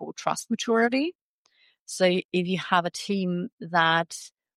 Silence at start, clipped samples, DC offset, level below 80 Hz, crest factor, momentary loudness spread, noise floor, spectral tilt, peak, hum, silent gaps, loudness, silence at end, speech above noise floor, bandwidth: 0 s; under 0.1%; under 0.1%; -76 dBFS; 20 dB; 10 LU; -65 dBFS; -4.5 dB/octave; -6 dBFS; none; 1.15-1.45 s, 1.79-1.86 s, 2.25-2.29 s, 3.52-3.58 s; -25 LUFS; 0.3 s; 40 dB; 14.5 kHz